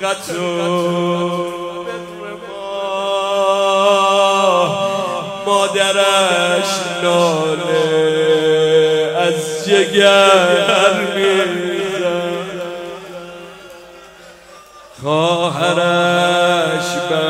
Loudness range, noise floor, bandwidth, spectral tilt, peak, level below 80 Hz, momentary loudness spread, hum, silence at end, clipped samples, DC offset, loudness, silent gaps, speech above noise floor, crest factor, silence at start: 9 LU; -40 dBFS; 16 kHz; -3.5 dB/octave; 0 dBFS; -58 dBFS; 14 LU; none; 0 s; under 0.1%; under 0.1%; -15 LUFS; none; 26 dB; 16 dB; 0 s